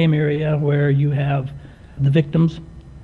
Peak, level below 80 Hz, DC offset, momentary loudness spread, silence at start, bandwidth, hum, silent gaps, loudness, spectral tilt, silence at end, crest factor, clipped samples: -6 dBFS; -44 dBFS; under 0.1%; 12 LU; 0 s; 4.3 kHz; none; none; -19 LUFS; -9.5 dB/octave; 0 s; 12 dB; under 0.1%